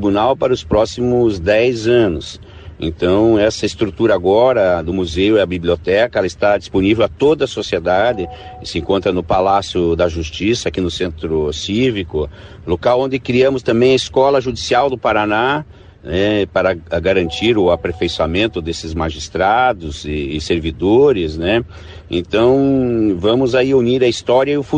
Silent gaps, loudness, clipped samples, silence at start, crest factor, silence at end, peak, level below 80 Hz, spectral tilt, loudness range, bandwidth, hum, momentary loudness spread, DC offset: none; -15 LUFS; under 0.1%; 0 s; 12 dB; 0 s; -2 dBFS; -36 dBFS; -6 dB/octave; 3 LU; 9.6 kHz; none; 10 LU; under 0.1%